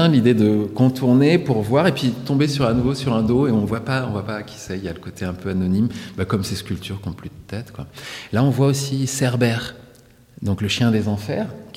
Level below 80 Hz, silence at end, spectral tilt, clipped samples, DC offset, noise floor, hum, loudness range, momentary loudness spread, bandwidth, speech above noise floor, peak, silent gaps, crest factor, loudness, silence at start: -46 dBFS; 0.05 s; -6.5 dB/octave; under 0.1%; under 0.1%; -49 dBFS; none; 7 LU; 15 LU; 16 kHz; 29 dB; -4 dBFS; none; 16 dB; -20 LUFS; 0 s